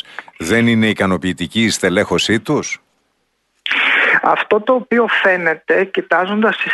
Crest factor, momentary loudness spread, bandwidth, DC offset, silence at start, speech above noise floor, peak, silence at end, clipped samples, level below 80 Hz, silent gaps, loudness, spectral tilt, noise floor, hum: 14 dB; 7 LU; 12 kHz; under 0.1%; 0.1 s; 51 dB; -2 dBFS; 0 s; under 0.1%; -52 dBFS; none; -15 LUFS; -4 dB/octave; -66 dBFS; none